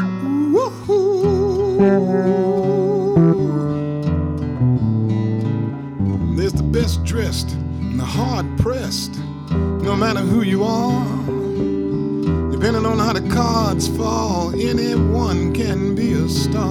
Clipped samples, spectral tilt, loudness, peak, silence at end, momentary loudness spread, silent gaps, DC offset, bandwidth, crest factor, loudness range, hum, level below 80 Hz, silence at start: under 0.1%; -7 dB/octave; -19 LUFS; -6 dBFS; 0 s; 6 LU; none; under 0.1%; 17 kHz; 12 dB; 4 LU; none; -32 dBFS; 0 s